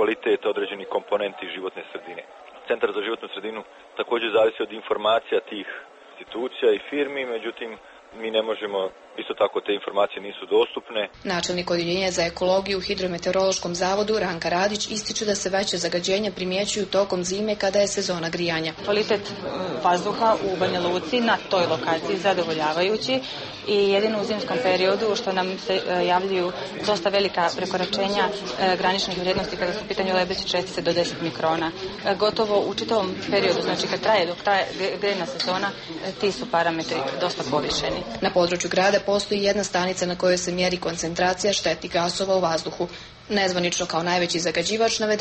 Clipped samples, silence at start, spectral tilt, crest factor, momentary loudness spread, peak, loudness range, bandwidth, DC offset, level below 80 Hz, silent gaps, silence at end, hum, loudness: under 0.1%; 0 s; -3.5 dB/octave; 16 dB; 8 LU; -8 dBFS; 4 LU; 8.8 kHz; under 0.1%; -54 dBFS; none; 0 s; none; -24 LUFS